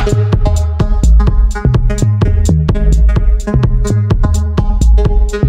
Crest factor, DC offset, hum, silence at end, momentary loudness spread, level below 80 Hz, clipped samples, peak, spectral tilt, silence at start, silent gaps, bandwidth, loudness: 8 dB; under 0.1%; none; 0 s; 3 LU; -10 dBFS; under 0.1%; -2 dBFS; -7.5 dB/octave; 0 s; none; 9.4 kHz; -13 LUFS